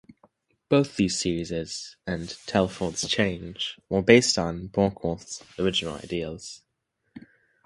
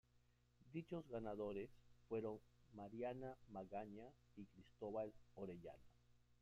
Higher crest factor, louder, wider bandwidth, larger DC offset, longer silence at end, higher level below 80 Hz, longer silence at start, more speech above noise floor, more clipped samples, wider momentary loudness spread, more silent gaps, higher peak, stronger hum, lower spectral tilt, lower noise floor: first, 26 dB vs 16 dB; first, -26 LUFS vs -53 LUFS; first, 11.5 kHz vs 10 kHz; neither; first, 0.45 s vs 0.05 s; first, -50 dBFS vs -76 dBFS; first, 0.7 s vs 0.15 s; first, 51 dB vs 26 dB; neither; about the same, 16 LU vs 14 LU; neither; first, 0 dBFS vs -36 dBFS; second, none vs 60 Hz at -75 dBFS; second, -4.5 dB/octave vs -8.5 dB/octave; about the same, -77 dBFS vs -78 dBFS